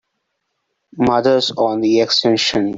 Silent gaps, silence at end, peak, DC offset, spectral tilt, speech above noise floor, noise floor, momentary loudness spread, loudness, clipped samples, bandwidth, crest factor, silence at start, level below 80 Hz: none; 0 s; -2 dBFS; under 0.1%; -4.5 dB/octave; 57 dB; -73 dBFS; 4 LU; -15 LUFS; under 0.1%; 7.8 kHz; 14 dB; 0.95 s; -52 dBFS